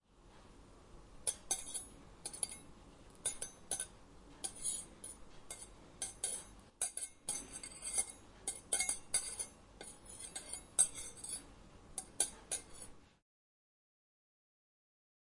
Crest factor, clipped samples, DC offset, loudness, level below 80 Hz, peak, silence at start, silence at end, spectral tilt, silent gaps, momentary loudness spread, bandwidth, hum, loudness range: 30 dB; under 0.1%; under 0.1%; -40 LUFS; -64 dBFS; -16 dBFS; 0.1 s; 2.1 s; 0 dB/octave; none; 19 LU; 11.5 kHz; none; 6 LU